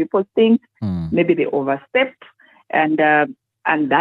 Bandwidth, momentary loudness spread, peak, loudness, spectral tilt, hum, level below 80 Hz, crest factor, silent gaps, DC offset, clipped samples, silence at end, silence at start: 4.9 kHz; 9 LU; -2 dBFS; -18 LUFS; -9 dB/octave; none; -52 dBFS; 16 dB; none; under 0.1%; under 0.1%; 0 s; 0 s